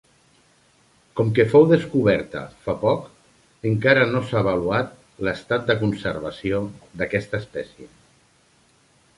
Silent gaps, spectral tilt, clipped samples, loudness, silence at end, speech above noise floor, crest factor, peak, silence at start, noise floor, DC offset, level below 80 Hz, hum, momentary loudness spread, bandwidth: none; -7.5 dB/octave; under 0.1%; -21 LUFS; 1.3 s; 38 dB; 20 dB; -2 dBFS; 1.15 s; -59 dBFS; under 0.1%; -50 dBFS; none; 16 LU; 11.5 kHz